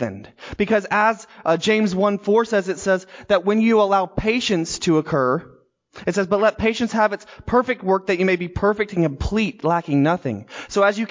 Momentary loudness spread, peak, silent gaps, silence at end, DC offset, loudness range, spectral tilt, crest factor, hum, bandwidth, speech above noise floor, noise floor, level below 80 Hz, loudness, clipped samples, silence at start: 8 LU; -6 dBFS; none; 0.05 s; under 0.1%; 2 LU; -5.5 dB/octave; 14 dB; none; 7.6 kHz; 26 dB; -46 dBFS; -42 dBFS; -20 LUFS; under 0.1%; 0 s